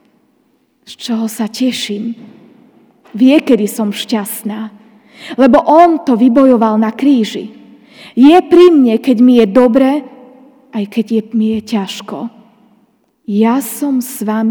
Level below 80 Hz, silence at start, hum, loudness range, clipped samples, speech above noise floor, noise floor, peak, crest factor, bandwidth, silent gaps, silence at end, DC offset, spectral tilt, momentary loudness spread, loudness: -52 dBFS; 0.9 s; none; 8 LU; 1%; 46 dB; -56 dBFS; 0 dBFS; 12 dB; over 20 kHz; none; 0 s; under 0.1%; -5.5 dB/octave; 18 LU; -11 LUFS